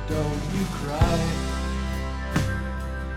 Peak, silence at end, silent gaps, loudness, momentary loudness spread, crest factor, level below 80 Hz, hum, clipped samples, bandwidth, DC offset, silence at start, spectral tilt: -4 dBFS; 0 s; none; -27 LUFS; 7 LU; 22 dB; -30 dBFS; none; under 0.1%; 15.5 kHz; under 0.1%; 0 s; -6 dB/octave